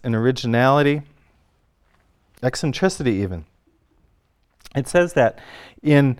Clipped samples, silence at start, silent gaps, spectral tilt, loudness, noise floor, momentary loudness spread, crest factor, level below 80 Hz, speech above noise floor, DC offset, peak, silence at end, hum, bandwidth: under 0.1%; 0.05 s; none; -6.5 dB/octave; -20 LUFS; -63 dBFS; 12 LU; 18 dB; -50 dBFS; 44 dB; under 0.1%; -2 dBFS; 0.05 s; none; 13.5 kHz